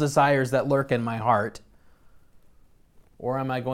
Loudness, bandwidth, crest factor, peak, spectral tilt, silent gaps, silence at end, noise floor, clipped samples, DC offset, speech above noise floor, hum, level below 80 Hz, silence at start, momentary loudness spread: -24 LUFS; 16 kHz; 18 dB; -8 dBFS; -6 dB/octave; none; 0 s; -55 dBFS; under 0.1%; under 0.1%; 32 dB; none; -58 dBFS; 0 s; 10 LU